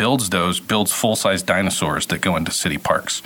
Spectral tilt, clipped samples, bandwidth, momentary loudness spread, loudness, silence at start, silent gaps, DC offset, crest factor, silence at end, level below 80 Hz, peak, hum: -3.5 dB/octave; under 0.1%; over 20 kHz; 3 LU; -19 LUFS; 0 s; none; under 0.1%; 18 dB; 0 s; -50 dBFS; -2 dBFS; none